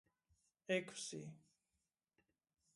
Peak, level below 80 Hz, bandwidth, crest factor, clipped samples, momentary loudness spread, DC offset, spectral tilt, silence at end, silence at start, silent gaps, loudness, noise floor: -26 dBFS; -88 dBFS; 11.5 kHz; 24 dB; under 0.1%; 16 LU; under 0.1%; -3.5 dB/octave; 1.35 s; 0.7 s; none; -45 LUFS; under -90 dBFS